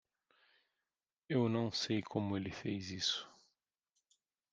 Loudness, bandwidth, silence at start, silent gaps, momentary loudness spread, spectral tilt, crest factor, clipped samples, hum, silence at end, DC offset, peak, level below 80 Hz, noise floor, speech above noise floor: -38 LUFS; 9.8 kHz; 1.3 s; none; 7 LU; -5 dB/octave; 20 dB; under 0.1%; none; 1.2 s; under 0.1%; -22 dBFS; -76 dBFS; under -90 dBFS; over 53 dB